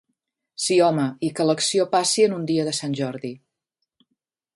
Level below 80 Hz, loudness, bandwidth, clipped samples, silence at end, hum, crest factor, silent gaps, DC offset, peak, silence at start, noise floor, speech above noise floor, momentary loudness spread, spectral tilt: -70 dBFS; -21 LUFS; 11.5 kHz; under 0.1%; 1.2 s; none; 16 dB; none; under 0.1%; -6 dBFS; 0.6 s; -80 dBFS; 59 dB; 11 LU; -4 dB/octave